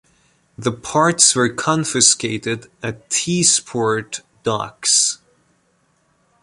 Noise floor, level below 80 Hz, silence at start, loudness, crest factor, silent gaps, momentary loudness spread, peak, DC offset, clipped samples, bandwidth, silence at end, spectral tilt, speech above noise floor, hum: -62 dBFS; -56 dBFS; 0.6 s; -16 LUFS; 20 dB; none; 13 LU; 0 dBFS; under 0.1%; under 0.1%; 12.5 kHz; 1.25 s; -2.5 dB/octave; 44 dB; none